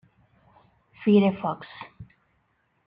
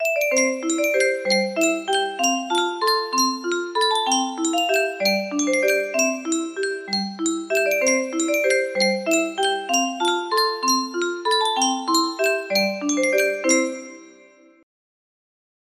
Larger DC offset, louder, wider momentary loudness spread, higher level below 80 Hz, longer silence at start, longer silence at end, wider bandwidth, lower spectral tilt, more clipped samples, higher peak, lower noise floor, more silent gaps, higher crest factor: neither; second, -24 LUFS vs -21 LUFS; first, 23 LU vs 5 LU; first, -64 dBFS vs -72 dBFS; first, 1 s vs 0 s; second, 0.85 s vs 1.55 s; second, 5 kHz vs 15.5 kHz; first, -10.5 dB/octave vs -2 dB/octave; neither; about the same, -8 dBFS vs -6 dBFS; first, -70 dBFS vs -51 dBFS; neither; about the same, 20 dB vs 16 dB